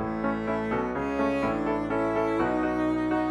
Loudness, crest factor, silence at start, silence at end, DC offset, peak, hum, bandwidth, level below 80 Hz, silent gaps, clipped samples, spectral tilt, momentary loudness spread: -27 LUFS; 12 dB; 0 s; 0 s; under 0.1%; -14 dBFS; none; 10.5 kHz; -48 dBFS; none; under 0.1%; -7.5 dB/octave; 3 LU